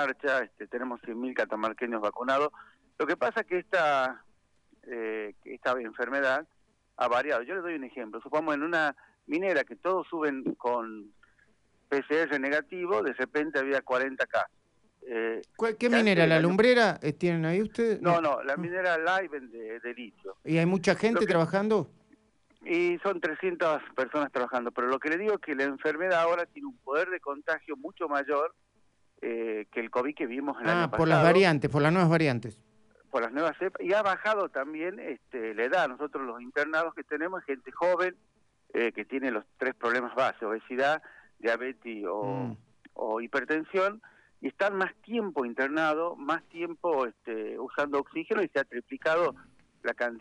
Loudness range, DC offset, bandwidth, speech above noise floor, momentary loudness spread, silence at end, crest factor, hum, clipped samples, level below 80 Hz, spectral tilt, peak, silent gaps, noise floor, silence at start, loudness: 6 LU; under 0.1%; 11 kHz; 38 dB; 12 LU; 0 s; 22 dB; none; under 0.1%; -68 dBFS; -6.5 dB/octave; -8 dBFS; none; -67 dBFS; 0 s; -29 LUFS